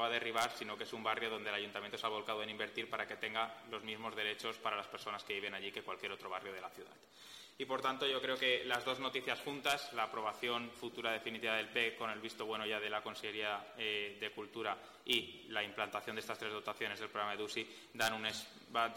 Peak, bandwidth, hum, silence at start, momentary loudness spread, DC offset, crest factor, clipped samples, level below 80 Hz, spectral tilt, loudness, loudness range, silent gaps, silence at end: -20 dBFS; 18 kHz; none; 0 s; 9 LU; under 0.1%; 22 dB; under 0.1%; -80 dBFS; -2.5 dB/octave; -40 LUFS; 5 LU; none; 0 s